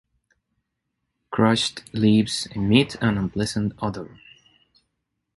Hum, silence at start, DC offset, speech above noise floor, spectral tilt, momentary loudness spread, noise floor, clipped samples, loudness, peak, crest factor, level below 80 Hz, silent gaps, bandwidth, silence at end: none; 1.3 s; under 0.1%; 57 dB; -5.5 dB/octave; 11 LU; -78 dBFS; under 0.1%; -22 LUFS; -4 dBFS; 20 dB; -50 dBFS; none; 11.5 kHz; 1.3 s